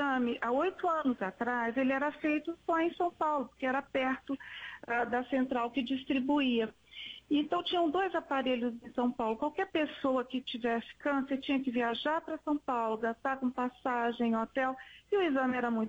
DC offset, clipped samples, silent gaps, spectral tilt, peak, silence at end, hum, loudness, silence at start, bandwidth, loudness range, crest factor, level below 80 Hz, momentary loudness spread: under 0.1%; under 0.1%; none; -5.5 dB/octave; -20 dBFS; 0 s; none; -33 LUFS; 0 s; 7.8 kHz; 1 LU; 12 dB; -68 dBFS; 5 LU